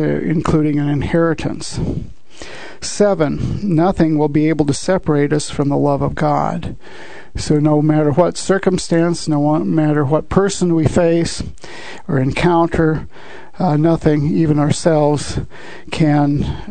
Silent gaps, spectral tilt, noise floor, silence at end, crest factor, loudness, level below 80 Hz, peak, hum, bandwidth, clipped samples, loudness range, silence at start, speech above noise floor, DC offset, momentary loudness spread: none; -6.5 dB/octave; -35 dBFS; 0 s; 16 dB; -16 LUFS; -36 dBFS; 0 dBFS; none; 9.4 kHz; under 0.1%; 3 LU; 0 s; 20 dB; 3%; 16 LU